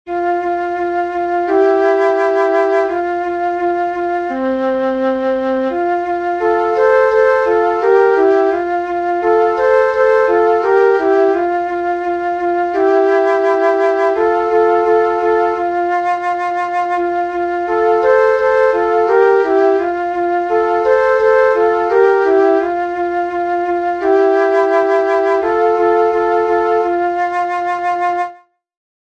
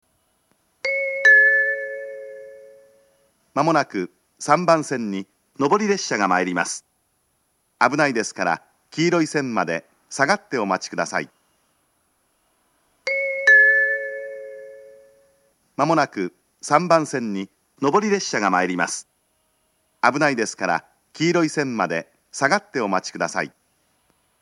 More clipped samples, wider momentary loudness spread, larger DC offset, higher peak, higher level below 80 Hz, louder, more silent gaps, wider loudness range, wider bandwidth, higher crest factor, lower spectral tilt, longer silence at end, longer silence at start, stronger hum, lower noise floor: neither; second, 6 LU vs 17 LU; neither; about the same, 0 dBFS vs 0 dBFS; first, -50 dBFS vs -76 dBFS; first, -14 LUFS vs -20 LUFS; neither; about the same, 3 LU vs 5 LU; second, 7.8 kHz vs 12 kHz; second, 12 dB vs 22 dB; first, -5.5 dB/octave vs -4 dB/octave; second, 0.8 s vs 0.95 s; second, 0.05 s vs 0.85 s; neither; second, -38 dBFS vs -68 dBFS